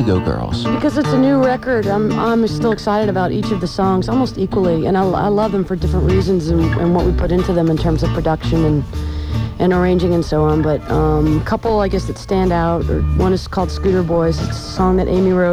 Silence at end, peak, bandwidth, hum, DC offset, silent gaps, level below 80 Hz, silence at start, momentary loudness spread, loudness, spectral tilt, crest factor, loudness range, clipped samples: 0 s; -2 dBFS; 14 kHz; none; under 0.1%; none; -26 dBFS; 0 s; 4 LU; -16 LUFS; -7.5 dB/octave; 12 dB; 1 LU; under 0.1%